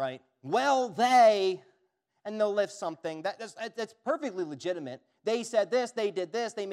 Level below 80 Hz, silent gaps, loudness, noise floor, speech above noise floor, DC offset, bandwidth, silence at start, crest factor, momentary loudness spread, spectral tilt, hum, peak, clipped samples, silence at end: -90 dBFS; none; -29 LUFS; -76 dBFS; 47 dB; under 0.1%; 13 kHz; 0 s; 18 dB; 16 LU; -4 dB/octave; none; -12 dBFS; under 0.1%; 0 s